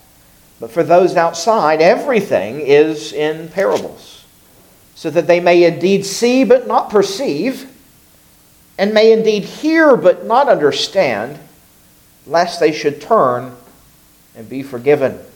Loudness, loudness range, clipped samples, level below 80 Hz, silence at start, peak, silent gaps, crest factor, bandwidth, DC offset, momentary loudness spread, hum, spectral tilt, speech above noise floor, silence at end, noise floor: -14 LUFS; 4 LU; under 0.1%; -58 dBFS; 0.6 s; 0 dBFS; none; 14 dB; 18.5 kHz; under 0.1%; 12 LU; none; -5 dB/octave; 35 dB; 0.15 s; -48 dBFS